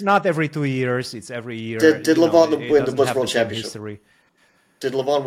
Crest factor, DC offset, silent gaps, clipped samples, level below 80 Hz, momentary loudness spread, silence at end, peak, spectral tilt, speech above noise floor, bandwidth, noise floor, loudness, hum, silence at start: 18 dB; under 0.1%; none; under 0.1%; -60 dBFS; 15 LU; 0 s; -2 dBFS; -5.5 dB/octave; 41 dB; 16 kHz; -60 dBFS; -19 LUFS; none; 0 s